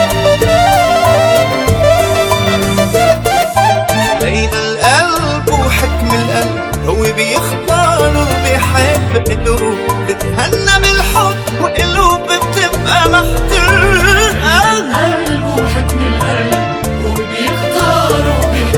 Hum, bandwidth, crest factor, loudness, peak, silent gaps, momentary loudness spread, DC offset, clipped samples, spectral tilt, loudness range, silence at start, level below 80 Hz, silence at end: none; 20 kHz; 10 dB; -11 LUFS; 0 dBFS; none; 6 LU; under 0.1%; 0.2%; -4.5 dB/octave; 2 LU; 0 s; -20 dBFS; 0 s